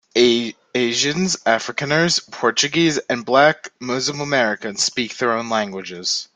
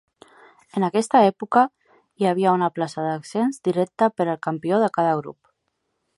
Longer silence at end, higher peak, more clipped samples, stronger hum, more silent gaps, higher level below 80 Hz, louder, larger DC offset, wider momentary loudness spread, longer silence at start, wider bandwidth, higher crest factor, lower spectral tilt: second, 0.1 s vs 0.85 s; about the same, -2 dBFS vs -2 dBFS; neither; neither; neither; first, -60 dBFS vs -72 dBFS; first, -19 LUFS vs -22 LUFS; neither; about the same, 7 LU vs 9 LU; second, 0.15 s vs 0.75 s; second, 9.6 kHz vs 11.5 kHz; about the same, 18 dB vs 20 dB; second, -3 dB/octave vs -6.5 dB/octave